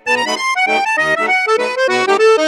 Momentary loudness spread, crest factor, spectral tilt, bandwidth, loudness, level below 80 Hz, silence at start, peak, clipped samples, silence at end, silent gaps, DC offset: 3 LU; 12 dB; -2 dB/octave; 14 kHz; -13 LUFS; -60 dBFS; 0.05 s; -2 dBFS; under 0.1%; 0 s; none; under 0.1%